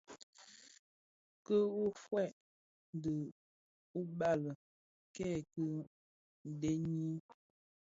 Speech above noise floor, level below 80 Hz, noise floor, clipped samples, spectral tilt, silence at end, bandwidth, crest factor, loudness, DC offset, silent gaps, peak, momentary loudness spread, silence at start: over 52 dB; -72 dBFS; under -90 dBFS; under 0.1%; -7.5 dB/octave; 0.75 s; 7.6 kHz; 18 dB; -40 LUFS; under 0.1%; 0.23-0.33 s, 0.79-1.45 s, 2.33-2.93 s, 3.32-3.94 s, 4.55-5.14 s, 5.87-6.45 s; -22 dBFS; 21 LU; 0.1 s